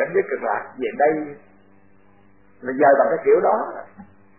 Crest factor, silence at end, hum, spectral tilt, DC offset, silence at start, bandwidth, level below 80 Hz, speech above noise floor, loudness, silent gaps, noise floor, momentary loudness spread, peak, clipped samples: 18 dB; 0.35 s; none; -10.5 dB/octave; 0.2%; 0 s; 3.1 kHz; -64 dBFS; 35 dB; -20 LUFS; none; -55 dBFS; 16 LU; -4 dBFS; under 0.1%